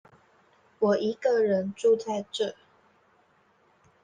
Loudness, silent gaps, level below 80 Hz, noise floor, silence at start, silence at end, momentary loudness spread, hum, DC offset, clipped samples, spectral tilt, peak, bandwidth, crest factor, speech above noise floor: -27 LUFS; none; -76 dBFS; -64 dBFS; 0.8 s; 1.5 s; 7 LU; none; under 0.1%; under 0.1%; -5.5 dB/octave; -12 dBFS; 9.6 kHz; 16 dB; 39 dB